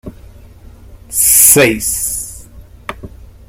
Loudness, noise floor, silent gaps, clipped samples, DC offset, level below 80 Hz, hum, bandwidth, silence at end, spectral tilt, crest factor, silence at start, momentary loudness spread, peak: -9 LUFS; -37 dBFS; none; 0.3%; under 0.1%; -36 dBFS; none; over 20 kHz; 0.25 s; -2 dB/octave; 16 dB; 0.05 s; 24 LU; 0 dBFS